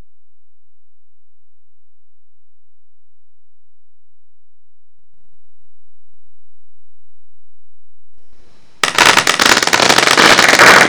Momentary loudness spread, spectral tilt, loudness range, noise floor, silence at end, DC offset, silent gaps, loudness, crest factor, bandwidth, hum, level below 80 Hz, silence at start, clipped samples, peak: 5 LU; -1 dB/octave; 9 LU; -62 dBFS; 0 s; 5%; none; -8 LUFS; 16 dB; over 20 kHz; none; -50 dBFS; 5.35 s; 0.5%; 0 dBFS